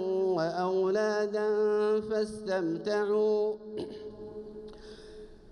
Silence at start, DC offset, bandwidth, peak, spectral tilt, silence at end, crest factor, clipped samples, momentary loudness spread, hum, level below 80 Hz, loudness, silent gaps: 0 s; under 0.1%; 10.5 kHz; -18 dBFS; -6 dB/octave; 0 s; 12 dB; under 0.1%; 20 LU; none; -62 dBFS; -30 LUFS; none